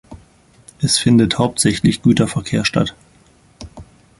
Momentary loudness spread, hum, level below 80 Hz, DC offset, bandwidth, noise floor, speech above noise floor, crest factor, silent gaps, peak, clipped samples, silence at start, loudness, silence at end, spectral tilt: 10 LU; none; -44 dBFS; under 0.1%; 12 kHz; -51 dBFS; 36 dB; 16 dB; none; -2 dBFS; under 0.1%; 0.1 s; -16 LUFS; 0.35 s; -4.5 dB/octave